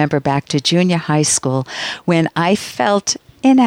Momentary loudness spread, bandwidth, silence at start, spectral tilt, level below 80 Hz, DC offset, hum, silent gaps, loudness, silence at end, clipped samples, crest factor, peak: 6 LU; 15.5 kHz; 0 s; -4.5 dB/octave; -56 dBFS; under 0.1%; none; none; -16 LUFS; 0 s; under 0.1%; 12 dB; -2 dBFS